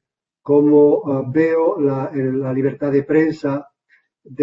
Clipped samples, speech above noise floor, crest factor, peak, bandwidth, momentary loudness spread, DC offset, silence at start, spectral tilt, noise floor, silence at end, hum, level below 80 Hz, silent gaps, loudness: under 0.1%; 44 dB; 14 dB; -4 dBFS; 7.2 kHz; 10 LU; under 0.1%; 0.45 s; -10 dB/octave; -60 dBFS; 0 s; none; -62 dBFS; none; -17 LUFS